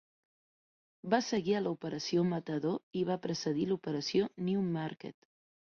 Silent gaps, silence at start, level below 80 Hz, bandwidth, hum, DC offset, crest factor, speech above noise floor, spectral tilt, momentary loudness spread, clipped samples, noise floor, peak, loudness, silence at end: 2.83-2.91 s; 1.05 s; -72 dBFS; 7.2 kHz; none; under 0.1%; 20 dB; over 57 dB; -6 dB/octave; 6 LU; under 0.1%; under -90 dBFS; -14 dBFS; -34 LUFS; 0.6 s